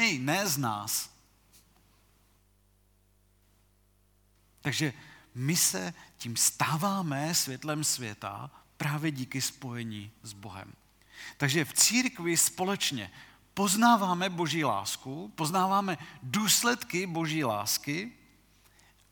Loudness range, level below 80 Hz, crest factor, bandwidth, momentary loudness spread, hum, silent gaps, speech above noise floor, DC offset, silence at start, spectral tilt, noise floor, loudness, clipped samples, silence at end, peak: 10 LU; -68 dBFS; 22 dB; 19.5 kHz; 19 LU; 50 Hz at -60 dBFS; none; 36 dB; under 0.1%; 0 s; -3 dB/octave; -66 dBFS; -29 LUFS; under 0.1%; 1 s; -8 dBFS